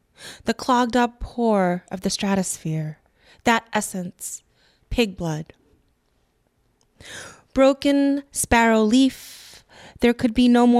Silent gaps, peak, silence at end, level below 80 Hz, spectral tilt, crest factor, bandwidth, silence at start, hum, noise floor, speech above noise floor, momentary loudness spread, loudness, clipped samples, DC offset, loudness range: none; -2 dBFS; 0 s; -44 dBFS; -4.5 dB/octave; 20 dB; 15 kHz; 0.2 s; none; -66 dBFS; 46 dB; 20 LU; -21 LUFS; under 0.1%; under 0.1%; 10 LU